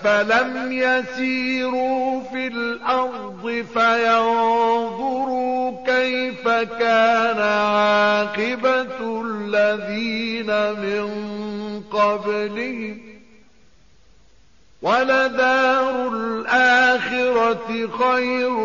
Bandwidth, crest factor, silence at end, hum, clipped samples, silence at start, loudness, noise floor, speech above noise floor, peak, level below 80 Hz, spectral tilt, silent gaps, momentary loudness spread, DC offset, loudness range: 7.2 kHz; 14 dB; 0 s; none; under 0.1%; 0 s; -20 LUFS; -56 dBFS; 36 dB; -6 dBFS; -60 dBFS; -1.5 dB/octave; none; 10 LU; 0.3%; 7 LU